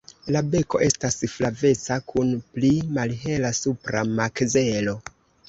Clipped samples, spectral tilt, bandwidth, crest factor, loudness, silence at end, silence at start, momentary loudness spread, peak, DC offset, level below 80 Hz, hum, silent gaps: under 0.1%; -5 dB/octave; 8.2 kHz; 18 dB; -23 LUFS; 0.4 s; 0.25 s; 5 LU; -6 dBFS; under 0.1%; -50 dBFS; none; none